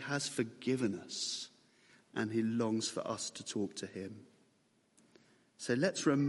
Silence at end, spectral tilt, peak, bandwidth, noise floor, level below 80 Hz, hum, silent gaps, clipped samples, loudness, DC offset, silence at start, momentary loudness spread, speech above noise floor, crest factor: 0 s; -4.5 dB/octave; -18 dBFS; 11.5 kHz; -73 dBFS; -80 dBFS; none; none; under 0.1%; -37 LUFS; under 0.1%; 0 s; 12 LU; 37 dB; 20 dB